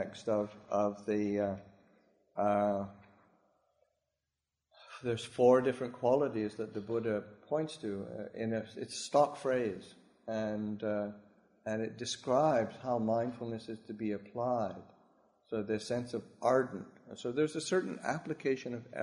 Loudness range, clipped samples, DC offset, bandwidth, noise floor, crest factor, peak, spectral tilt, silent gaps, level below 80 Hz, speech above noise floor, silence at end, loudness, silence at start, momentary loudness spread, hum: 5 LU; under 0.1%; under 0.1%; 11 kHz; -89 dBFS; 22 dB; -14 dBFS; -5.5 dB/octave; none; -74 dBFS; 55 dB; 0 s; -35 LUFS; 0 s; 12 LU; none